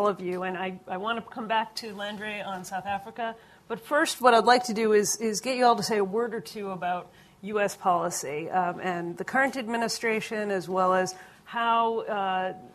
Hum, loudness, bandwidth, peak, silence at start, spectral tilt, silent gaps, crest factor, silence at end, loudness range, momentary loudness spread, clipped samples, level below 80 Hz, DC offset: none; -27 LUFS; 14 kHz; -4 dBFS; 0 s; -3.5 dB/octave; none; 22 dB; 0.05 s; 7 LU; 12 LU; under 0.1%; -70 dBFS; under 0.1%